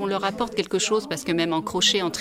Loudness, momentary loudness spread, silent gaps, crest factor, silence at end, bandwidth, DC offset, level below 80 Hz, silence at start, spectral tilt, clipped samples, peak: -23 LUFS; 6 LU; none; 18 dB; 0 s; 16 kHz; under 0.1%; -56 dBFS; 0 s; -3 dB/octave; under 0.1%; -6 dBFS